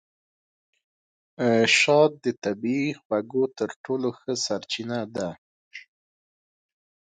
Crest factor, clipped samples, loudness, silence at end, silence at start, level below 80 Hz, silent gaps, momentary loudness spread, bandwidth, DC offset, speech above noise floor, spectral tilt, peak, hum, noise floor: 20 dB; under 0.1%; -24 LUFS; 1.3 s; 1.4 s; -70 dBFS; 2.38-2.42 s, 3.05-3.10 s, 3.76-3.84 s, 5.38-5.71 s; 15 LU; 9.4 kHz; under 0.1%; over 66 dB; -4 dB/octave; -6 dBFS; none; under -90 dBFS